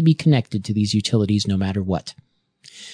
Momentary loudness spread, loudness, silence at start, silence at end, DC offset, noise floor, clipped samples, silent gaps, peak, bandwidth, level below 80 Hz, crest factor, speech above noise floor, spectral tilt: 9 LU; -20 LUFS; 0 s; 0 s; under 0.1%; -51 dBFS; under 0.1%; none; -4 dBFS; 10 kHz; -54 dBFS; 16 dB; 32 dB; -6.5 dB/octave